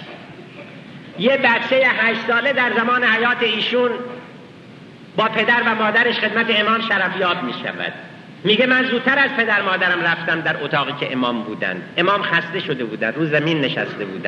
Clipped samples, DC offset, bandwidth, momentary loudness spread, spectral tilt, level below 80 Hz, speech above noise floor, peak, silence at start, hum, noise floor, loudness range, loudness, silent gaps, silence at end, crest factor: under 0.1%; under 0.1%; 8.4 kHz; 13 LU; -6 dB/octave; -68 dBFS; 22 dB; -4 dBFS; 0 s; none; -40 dBFS; 3 LU; -17 LUFS; none; 0 s; 16 dB